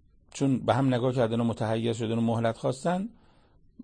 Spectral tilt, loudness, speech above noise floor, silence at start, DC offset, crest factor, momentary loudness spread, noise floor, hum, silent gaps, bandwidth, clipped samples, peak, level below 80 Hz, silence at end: -7 dB/octave; -28 LUFS; 33 dB; 0.35 s; under 0.1%; 18 dB; 5 LU; -60 dBFS; none; none; 9.8 kHz; under 0.1%; -10 dBFS; -60 dBFS; 0.7 s